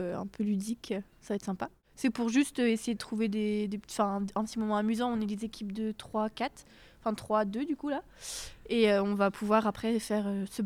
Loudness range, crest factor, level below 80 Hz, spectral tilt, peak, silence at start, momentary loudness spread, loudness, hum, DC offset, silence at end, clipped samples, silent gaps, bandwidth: 4 LU; 18 dB; -60 dBFS; -5.5 dB/octave; -14 dBFS; 0 s; 10 LU; -32 LUFS; none; under 0.1%; 0 s; under 0.1%; none; 15.5 kHz